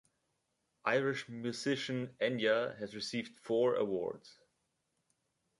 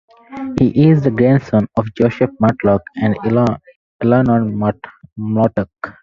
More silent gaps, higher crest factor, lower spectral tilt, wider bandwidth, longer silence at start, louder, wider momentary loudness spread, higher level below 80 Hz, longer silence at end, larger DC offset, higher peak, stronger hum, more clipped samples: second, none vs 3.76-3.99 s; first, 20 dB vs 14 dB; second, -5 dB/octave vs -10 dB/octave; first, 11.5 kHz vs 7.2 kHz; first, 0.85 s vs 0.3 s; second, -35 LUFS vs -15 LUFS; second, 9 LU vs 15 LU; second, -80 dBFS vs -44 dBFS; first, 1.3 s vs 0.1 s; neither; second, -16 dBFS vs 0 dBFS; neither; neither